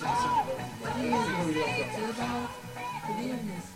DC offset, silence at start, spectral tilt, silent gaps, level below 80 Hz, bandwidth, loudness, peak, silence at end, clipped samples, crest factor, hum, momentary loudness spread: under 0.1%; 0 s; -5 dB/octave; none; -58 dBFS; 16 kHz; -31 LUFS; -16 dBFS; 0 s; under 0.1%; 16 dB; none; 8 LU